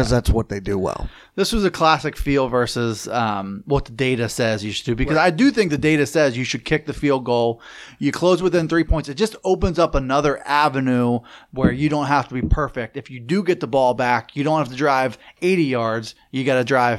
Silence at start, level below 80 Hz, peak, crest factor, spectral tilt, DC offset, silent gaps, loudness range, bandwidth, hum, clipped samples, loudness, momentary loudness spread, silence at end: 0 s; -32 dBFS; -2 dBFS; 18 dB; -5.5 dB/octave; under 0.1%; none; 2 LU; 15.5 kHz; none; under 0.1%; -20 LUFS; 7 LU; 0 s